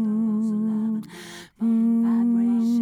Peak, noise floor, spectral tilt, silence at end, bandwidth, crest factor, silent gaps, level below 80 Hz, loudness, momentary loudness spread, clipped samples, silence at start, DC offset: -16 dBFS; -41 dBFS; -7.5 dB/octave; 0 s; 10.5 kHz; 6 dB; none; -72 dBFS; -23 LUFS; 15 LU; under 0.1%; 0 s; under 0.1%